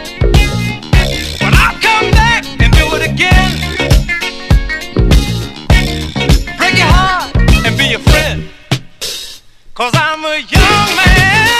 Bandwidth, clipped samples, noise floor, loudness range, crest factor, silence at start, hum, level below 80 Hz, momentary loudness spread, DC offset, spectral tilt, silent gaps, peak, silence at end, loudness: 14.5 kHz; 0.7%; -32 dBFS; 3 LU; 10 dB; 0 s; none; -14 dBFS; 10 LU; 0.6%; -4.5 dB/octave; none; 0 dBFS; 0 s; -11 LUFS